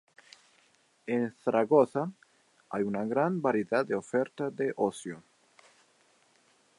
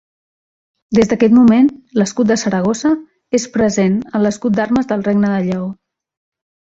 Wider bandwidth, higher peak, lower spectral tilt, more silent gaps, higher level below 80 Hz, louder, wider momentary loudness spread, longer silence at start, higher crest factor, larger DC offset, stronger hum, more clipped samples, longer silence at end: first, 11.5 kHz vs 8 kHz; second, -10 dBFS vs 0 dBFS; about the same, -7 dB/octave vs -6 dB/octave; neither; second, -78 dBFS vs -50 dBFS; second, -30 LUFS vs -15 LUFS; first, 14 LU vs 9 LU; first, 1.05 s vs 0.9 s; first, 22 dB vs 14 dB; neither; neither; neither; first, 1.6 s vs 1 s